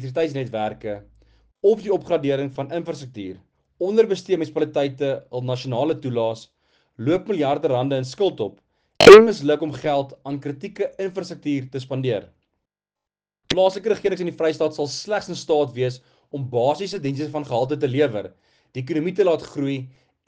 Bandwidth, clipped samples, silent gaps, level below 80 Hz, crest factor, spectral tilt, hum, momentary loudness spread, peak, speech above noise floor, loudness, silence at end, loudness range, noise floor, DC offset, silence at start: 10 kHz; 0.2%; none; -56 dBFS; 20 dB; -5.5 dB/octave; none; 11 LU; 0 dBFS; 69 dB; -20 LUFS; 0.4 s; 10 LU; -89 dBFS; under 0.1%; 0 s